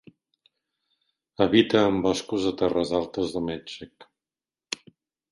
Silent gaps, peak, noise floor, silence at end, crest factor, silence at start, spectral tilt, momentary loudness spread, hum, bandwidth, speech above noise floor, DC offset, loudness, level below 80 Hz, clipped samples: none; -6 dBFS; under -90 dBFS; 0.55 s; 22 dB; 1.4 s; -5 dB/octave; 16 LU; none; 11.5 kHz; over 66 dB; under 0.1%; -25 LUFS; -56 dBFS; under 0.1%